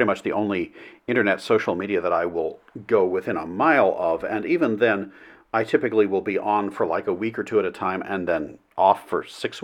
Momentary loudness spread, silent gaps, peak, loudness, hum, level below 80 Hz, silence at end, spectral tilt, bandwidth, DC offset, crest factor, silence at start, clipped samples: 9 LU; none; -2 dBFS; -23 LUFS; none; -62 dBFS; 0 s; -6.5 dB/octave; 13 kHz; under 0.1%; 20 dB; 0 s; under 0.1%